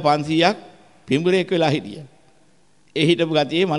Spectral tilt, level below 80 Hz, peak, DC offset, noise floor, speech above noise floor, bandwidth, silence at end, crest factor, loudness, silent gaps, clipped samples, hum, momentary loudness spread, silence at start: -6 dB/octave; -62 dBFS; -4 dBFS; 0.2%; -59 dBFS; 40 dB; 11.5 kHz; 0 s; 18 dB; -19 LUFS; none; under 0.1%; none; 14 LU; 0 s